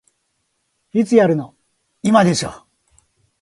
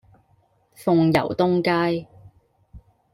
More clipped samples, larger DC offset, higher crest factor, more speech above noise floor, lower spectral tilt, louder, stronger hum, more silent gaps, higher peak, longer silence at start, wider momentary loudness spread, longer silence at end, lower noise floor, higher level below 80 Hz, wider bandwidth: neither; neither; about the same, 20 dB vs 20 dB; first, 55 dB vs 42 dB; second, -5.5 dB/octave vs -7.5 dB/octave; first, -17 LUFS vs -21 LUFS; neither; neither; first, 0 dBFS vs -4 dBFS; first, 0.95 s vs 0.8 s; first, 12 LU vs 9 LU; first, 0.85 s vs 0.35 s; first, -70 dBFS vs -62 dBFS; about the same, -56 dBFS vs -54 dBFS; second, 11.5 kHz vs 15.5 kHz